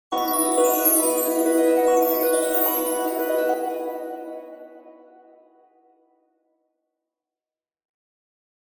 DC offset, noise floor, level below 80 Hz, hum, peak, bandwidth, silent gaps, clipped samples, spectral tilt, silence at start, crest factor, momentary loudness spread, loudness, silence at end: under 0.1%; under -90 dBFS; -70 dBFS; none; -6 dBFS; 16 kHz; none; under 0.1%; -1 dB/octave; 0.1 s; 18 dB; 16 LU; -20 LUFS; 3.7 s